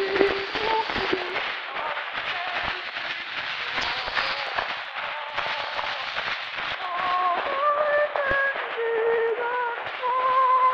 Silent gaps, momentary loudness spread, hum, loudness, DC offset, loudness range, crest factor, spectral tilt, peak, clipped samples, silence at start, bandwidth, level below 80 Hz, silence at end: none; 7 LU; none; -25 LUFS; under 0.1%; 3 LU; 24 dB; -3.5 dB/octave; 0 dBFS; under 0.1%; 0 s; 7.8 kHz; -56 dBFS; 0 s